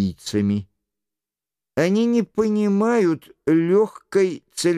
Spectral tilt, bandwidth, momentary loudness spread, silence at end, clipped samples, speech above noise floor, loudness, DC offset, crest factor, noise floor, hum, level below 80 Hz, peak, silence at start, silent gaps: -6 dB/octave; 14.5 kHz; 6 LU; 0 s; under 0.1%; 69 dB; -21 LUFS; under 0.1%; 14 dB; -89 dBFS; none; -58 dBFS; -6 dBFS; 0 s; none